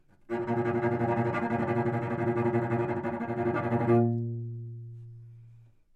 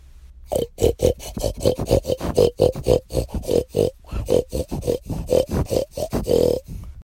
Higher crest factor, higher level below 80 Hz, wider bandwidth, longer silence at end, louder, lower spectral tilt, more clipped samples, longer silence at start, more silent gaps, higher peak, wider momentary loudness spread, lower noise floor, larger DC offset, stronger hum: about the same, 18 dB vs 18 dB; second, -64 dBFS vs -32 dBFS; second, 4.5 kHz vs 16.5 kHz; first, 0.4 s vs 0 s; second, -29 LUFS vs -22 LUFS; first, -10 dB/octave vs -6 dB/octave; neither; about the same, 0.3 s vs 0.25 s; neither; second, -12 dBFS vs -2 dBFS; first, 17 LU vs 8 LU; first, -55 dBFS vs -43 dBFS; neither; neither